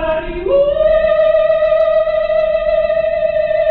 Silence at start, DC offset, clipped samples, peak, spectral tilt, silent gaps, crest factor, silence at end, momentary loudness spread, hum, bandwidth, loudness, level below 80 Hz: 0 s; under 0.1%; under 0.1%; -4 dBFS; -7.5 dB/octave; none; 10 dB; 0 s; 4 LU; none; 4.6 kHz; -14 LUFS; -34 dBFS